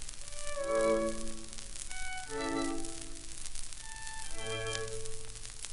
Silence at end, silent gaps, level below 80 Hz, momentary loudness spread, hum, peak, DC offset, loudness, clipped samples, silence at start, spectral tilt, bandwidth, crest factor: 0 s; none; -46 dBFS; 13 LU; none; -12 dBFS; under 0.1%; -38 LUFS; under 0.1%; 0 s; -3 dB/octave; 11.5 kHz; 24 dB